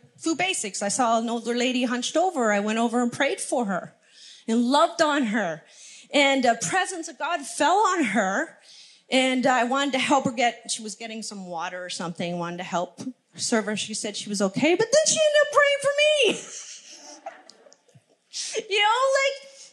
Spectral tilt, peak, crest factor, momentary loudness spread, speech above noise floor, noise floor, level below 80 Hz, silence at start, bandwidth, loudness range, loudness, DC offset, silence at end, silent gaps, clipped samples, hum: -2.5 dB/octave; -6 dBFS; 20 dB; 15 LU; 35 dB; -59 dBFS; -82 dBFS; 0.2 s; 12.5 kHz; 6 LU; -23 LUFS; under 0.1%; 0.05 s; none; under 0.1%; none